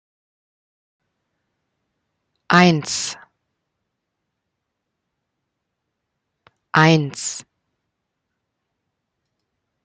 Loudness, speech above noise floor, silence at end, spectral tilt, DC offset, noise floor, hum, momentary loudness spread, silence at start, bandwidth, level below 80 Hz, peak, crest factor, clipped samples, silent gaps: -17 LUFS; 62 dB; 2.45 s; -4.5 dB/octave; under 0.1%; -78 dBFS; none; 15 LU; 2.5 s; 9.4 kHz; -64 dBFS; -2 dBFS; 24 dB; under 0.1%; none